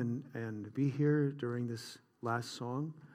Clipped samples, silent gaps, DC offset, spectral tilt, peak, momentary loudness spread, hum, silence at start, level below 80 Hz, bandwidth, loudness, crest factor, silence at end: under 0.1%; none; under 0.1%; -7 dB/octave; -20 dBFS; 11 LU; none; 0 s; -84 dBFS; 15 kHz; -37 LUFS; 16 dB; 0 s